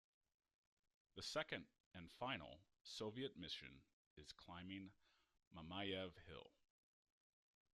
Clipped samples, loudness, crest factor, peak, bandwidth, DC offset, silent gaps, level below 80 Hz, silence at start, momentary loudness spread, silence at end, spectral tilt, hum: under 0.1%; -52 LUFS; 24 dB; -32 dBFS; 13 kHz; under 0.1%; 1.80-1.91 s, 3.93-4.17 s, 5.47-5.51 s; -80 dBFS; 1.15 s; 16 LU; 1.25 s; -4 dB/octave; none